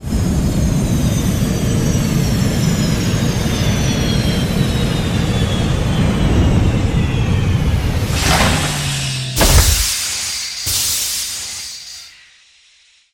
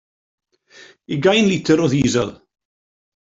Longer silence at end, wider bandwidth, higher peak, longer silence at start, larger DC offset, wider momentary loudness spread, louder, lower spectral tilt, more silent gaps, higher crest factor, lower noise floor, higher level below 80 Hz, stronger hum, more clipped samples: first, 1.05 s vs 0.85 s; first, 18 kHz vs 8 kHz; about the same, 0 dBFS vs -2 dBFS; second, 0 s vs 1.1 s; neither; second, 6 LU vs 10 LU; about the same, -16 LUFS vs -17 LUFS; about the same, -4.5 dB/octave vs -5 dB/octave; neither; about the same, 16 dB vs 18 dB; first, -51 dBFS vs -47 dBFS; first, -22 dBFS vs -52 dBFS; neither; neither